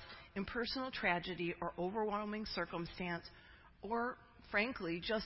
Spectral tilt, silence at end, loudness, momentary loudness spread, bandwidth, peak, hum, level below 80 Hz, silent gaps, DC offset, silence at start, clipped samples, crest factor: -8 dB/octave; 0 s; -40 LUFS; 10 LU; 5.8 kHz; -20 dBFS; none; -62 dBFS; none; under 0.1%; 0 s; under 0.1%; 20 dB